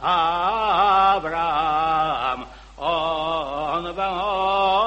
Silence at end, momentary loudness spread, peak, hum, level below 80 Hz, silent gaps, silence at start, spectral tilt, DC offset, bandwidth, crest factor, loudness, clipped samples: 0 s; 8 LU; -6 dBFS; none; -46 dBFS; none; 0 s; -5 dB/octave; under 0.1%; 8.4 kHz; 16 dB; -21 LUFS; under 0.1%